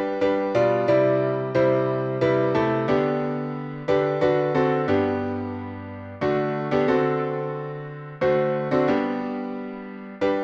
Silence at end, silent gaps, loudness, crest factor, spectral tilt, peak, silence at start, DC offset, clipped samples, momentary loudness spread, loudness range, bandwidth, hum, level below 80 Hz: 0 s; none; -23 LUFS; 16 dB; -8 dB/octave; -8 dBFS; 0 s; under 0.1%; under 0.1%; 13 LU; 4 LU; 7.2 kHz; none; -56 dBFS